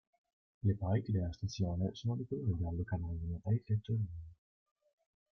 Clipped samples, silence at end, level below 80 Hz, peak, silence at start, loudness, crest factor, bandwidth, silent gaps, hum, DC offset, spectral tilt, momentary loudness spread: under 0.1%; 1.05 s; -56 dBFS; -20 dBFS; 0.65 s; -38 LUFS; 16 dB; 6.6 kHz; none; none; under 0.1%; -8 dB/octave; 6 LU